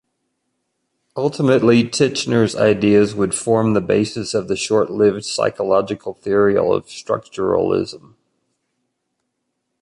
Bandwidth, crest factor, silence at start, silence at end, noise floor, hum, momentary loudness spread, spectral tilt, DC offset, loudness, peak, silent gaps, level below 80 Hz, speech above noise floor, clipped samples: 11 kHz; 16 dB; 1.15 s; 1.85 s; -74 dBFS; none; 9 LU; -5.5 dB/octave; under 0.1%; -17 LUFS; -2 dBFS; none; -52 dBFS; 57 dB; under 0.1%